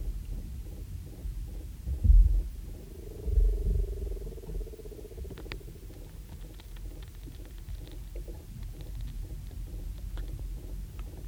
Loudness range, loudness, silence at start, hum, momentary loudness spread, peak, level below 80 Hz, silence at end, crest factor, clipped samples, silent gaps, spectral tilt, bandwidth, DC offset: 14 LU; -36 LUFS; 0 s; none; 16 LU; -10 dBFS; -32 dBFS; 0 s; 22 dB; under 0.1%; none; -7 dB/octave; 16 kHz; under 0.1%